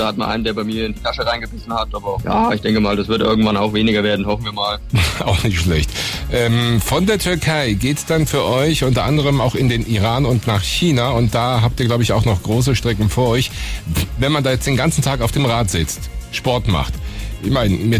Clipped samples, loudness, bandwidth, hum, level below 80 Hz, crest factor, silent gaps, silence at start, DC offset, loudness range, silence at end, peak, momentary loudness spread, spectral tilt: under 0.1%; -17 LUFS; 16 kHz; none; -28 dBFS; 12 dB; none; 0 s; under 0.1%; 2 LU; 0 s; -6 dBFS; 6 LU; -5.5 dB/octave